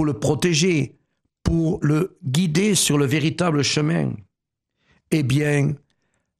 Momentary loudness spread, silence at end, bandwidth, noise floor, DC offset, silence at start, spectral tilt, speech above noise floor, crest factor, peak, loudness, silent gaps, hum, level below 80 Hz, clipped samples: 8 LU; 0.65 s; 14 kHz; -81 dBFS; under 0.1%; 0 s; -5 dB/octave; 61 dB; 16 dB; -6 dBFS; -20 LUFS; none; none; -42 dBFS; under 0.1%